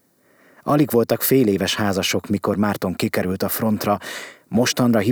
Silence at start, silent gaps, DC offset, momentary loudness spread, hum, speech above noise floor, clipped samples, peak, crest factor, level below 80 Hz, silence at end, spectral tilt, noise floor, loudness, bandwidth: 0.65 s; none; under 0.1%; 7 LU; none; 37 dB; under 0.1%; -4 dBFS; 16 dB; -58 dBFS; 0 s; -5 dB/octave; -56 dBFS; -20 LUFS; over 20 kHz